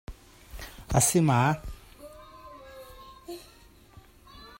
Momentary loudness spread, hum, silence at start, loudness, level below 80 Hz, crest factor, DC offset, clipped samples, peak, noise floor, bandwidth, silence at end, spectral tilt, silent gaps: 26 LU; none; 0.1 s; -24 LUFS; -46 dBFS; 22 dB; under 0.1%; under 0.1%; -8 dBFS; -55 dBFS; 16.5 kHz; 0.1 s; -4.5 dB/octave; none